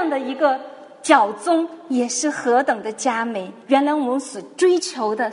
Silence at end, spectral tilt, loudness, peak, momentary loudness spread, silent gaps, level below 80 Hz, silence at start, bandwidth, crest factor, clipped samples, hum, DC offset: 0 s; -2.5 dB/octave; -20 LUFS; 0 dBFS; 10 LU; none; -74 dBFS; 0 s; 11 kHz; 20 dB; under 0.1%; none; under 0.1%